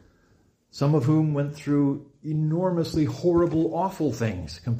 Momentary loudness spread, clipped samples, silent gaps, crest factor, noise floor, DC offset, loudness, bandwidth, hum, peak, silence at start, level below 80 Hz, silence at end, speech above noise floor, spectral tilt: 8 LU; under 0.1%; none; 14 dB; -62 dBFS; under 0.1%; -25 LUFS; 15 kHz; none; -12 dBFS; 0.75 s; -52 dBFS; 0 s; 38 dB; -8 dB/octave